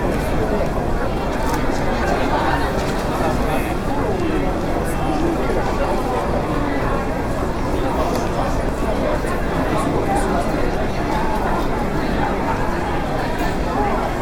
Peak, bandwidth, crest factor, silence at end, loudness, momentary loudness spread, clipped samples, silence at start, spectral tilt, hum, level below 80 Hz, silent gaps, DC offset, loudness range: -4 dBFS; 17 kHz; 14 dB; 0 s; -21 LUFS; 3 LU; under 0.1%; 0 s; -6 dB/octave; none; -26 dBFS; none; under 0.1%; 1 LU